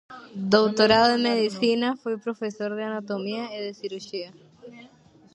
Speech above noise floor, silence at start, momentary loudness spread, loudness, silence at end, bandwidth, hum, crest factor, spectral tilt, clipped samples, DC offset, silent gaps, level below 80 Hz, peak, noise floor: 30 dB; 0.1 s; 16 LU; -24 LUFS; 0.5 s; 9.2 kHz; none; 22 dB; -5 dB/octave; under 0.1%; under 0.1%; none; -62 dBFS; -4 dBFS; -54 dBFS